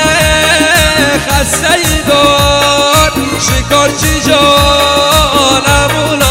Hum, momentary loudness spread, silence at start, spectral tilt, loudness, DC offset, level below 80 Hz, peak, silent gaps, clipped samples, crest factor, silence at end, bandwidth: none; 4 LU; 0 s; -3 dB/octave; -8 LUFS; under 0.1%; -22 dBFS; 0 dBFS; none; 2%; 8 dB; 0 s; over 20 kHz